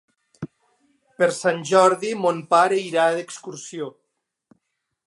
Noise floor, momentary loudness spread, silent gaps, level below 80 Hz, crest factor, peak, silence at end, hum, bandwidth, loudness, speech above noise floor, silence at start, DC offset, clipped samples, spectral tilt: -78 dBFS; 21 LU; none; -74 dBFS; 20 dB; -2 dBFS; 1.15 s; none; 11.5 kHz; -20 LUFS; 57 dB; 0.4 s; under 0.1%; under 0.1%; -4 dB/octave